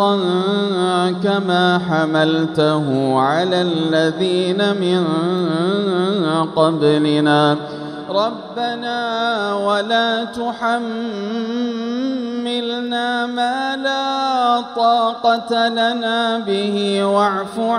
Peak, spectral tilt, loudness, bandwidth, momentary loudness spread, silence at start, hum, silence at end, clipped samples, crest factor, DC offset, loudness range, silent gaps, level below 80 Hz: 0 dBFS; -6 dB/octave; -18 LUFS; 11 kHz; 7 LU; 0 s; none; 0 s; under 0.1%; 16 dB; under 0.1%; 4 LU; none; -62 dBFS